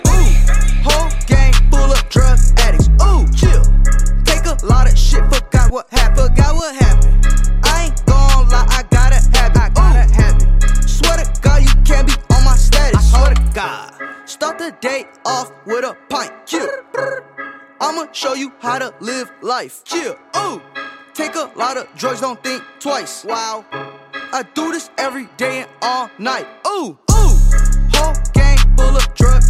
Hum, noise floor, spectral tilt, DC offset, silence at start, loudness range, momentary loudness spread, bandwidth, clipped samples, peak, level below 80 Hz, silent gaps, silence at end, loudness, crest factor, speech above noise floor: none; -32 dBFS; -4.5 dB/octave; under 0.1%; 0.05 s; 9 LU; 11 LU; 13.5 kHz; under 0.1%; 0 dBFS; -12 dBFS; none; 0 s; -15 LUFS; 10 dB; 16 dB